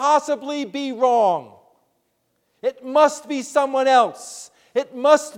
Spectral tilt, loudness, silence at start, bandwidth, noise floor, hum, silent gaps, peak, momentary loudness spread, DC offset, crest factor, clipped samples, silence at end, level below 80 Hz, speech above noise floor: -3 dB/octave; -20 LUFS; 0 s; 15.5 kHz; -70 dBFS; none; none; -2 dBFS; 11 LU; under 0.1%; 18 dB; under 0.1%; 0 s; -76 dBFS; 50 dB